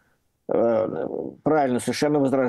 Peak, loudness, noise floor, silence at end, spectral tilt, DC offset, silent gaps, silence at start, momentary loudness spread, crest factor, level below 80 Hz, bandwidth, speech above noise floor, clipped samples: -8 dBFS; -23 LUFS; -42 dBFS; 0 s; -6 dB/octave; under 0.1%; none; 0.5 s; 8 LU; 16 dB; -64 dBFS; 12.5 kHz; 20 dB; under 0.1%